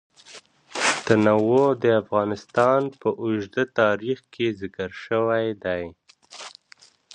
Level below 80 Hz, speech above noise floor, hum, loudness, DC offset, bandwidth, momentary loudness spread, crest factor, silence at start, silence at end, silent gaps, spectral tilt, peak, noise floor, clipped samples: -60 dBFS; 32 dB; none; -23 LUFS; under 0.1%; 11 kHz; 15 LU; 20 dB; 0.3 s; 0.65 s; none; -5 dB/octave; -2 dBFS; -54 dBFS; under 0.1%